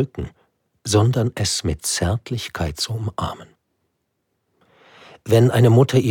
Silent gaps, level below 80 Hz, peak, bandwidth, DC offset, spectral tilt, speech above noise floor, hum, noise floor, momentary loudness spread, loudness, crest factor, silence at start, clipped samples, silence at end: none; -42 dBFS; -2 dBFS; 17 kHz; under 0.1%; -5.5 dB/octave; 54 dB; none; -73 dBFS; 19 LU; -19 LUFS; 18 dB; 0 s; under 0.1%; 0 s